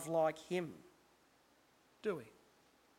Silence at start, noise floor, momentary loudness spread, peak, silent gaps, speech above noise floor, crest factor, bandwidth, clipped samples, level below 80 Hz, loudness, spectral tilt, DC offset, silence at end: 0 s; -71 dBFS; 20 LU; -24 dBFS; none; 32 dB; 18 dB; 16.5 kHz; under 0.1%; -80 dBFS; -41 LUFS; -5.5 dB/octave; under 0.1%; 0.7 s